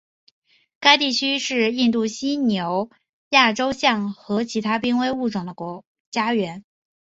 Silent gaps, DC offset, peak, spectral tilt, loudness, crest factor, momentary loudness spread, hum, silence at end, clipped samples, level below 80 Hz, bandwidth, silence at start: 3.09-3.31 s, 5.87-6.12 s; under 0.1%; -2 dBFS; -3.5 dB/octave; -20 LUFS; 22 dB; 14 LU; none; 0.5 s; under 0.1%; -62 dBFS; 7.8 kHz; 0.8 s